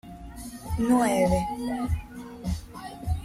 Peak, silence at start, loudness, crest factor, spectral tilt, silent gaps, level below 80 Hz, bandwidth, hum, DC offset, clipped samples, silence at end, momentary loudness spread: -12 dBFS; 0.05 s; -27 LUFS; 16 dB; -6.5 dB/octave; none; -38 dBFS; 16 kHz; none; under 0.1%; under 0.1%; 0 s; 19 LU